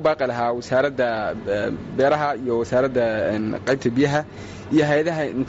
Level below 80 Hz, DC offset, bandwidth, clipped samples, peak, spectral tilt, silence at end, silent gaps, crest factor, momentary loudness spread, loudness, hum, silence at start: -50 dBFS; under 0.1%; 8 kHz; under 0.1%; -8 dBFS; -5 dB/octave; 0 s; none; 14 dB; 5 LU; -22 LUFS; none; 0 s